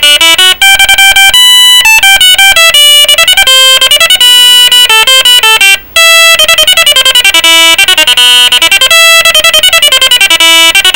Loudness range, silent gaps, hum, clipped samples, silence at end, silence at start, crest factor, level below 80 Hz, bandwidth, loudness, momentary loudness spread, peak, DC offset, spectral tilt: 1 LU; none; none; 20%; 0 s; 0 s; 2 dB; -34 dBFS; over 20 kHz; 0 LUFS; 2 LU; 0 dBFS; 2%; 2.5 dB/octave